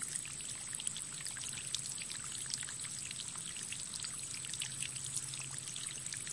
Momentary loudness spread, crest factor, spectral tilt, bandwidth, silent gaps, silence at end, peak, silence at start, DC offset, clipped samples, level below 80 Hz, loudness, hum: 2 LU; 28 dB; 0 dB/octave; 11.5 kHz; none; 0 s; -14 dBFS; 0 s; under 0.1%; under 0.1%; -72 dBFS; -40 LUFS; none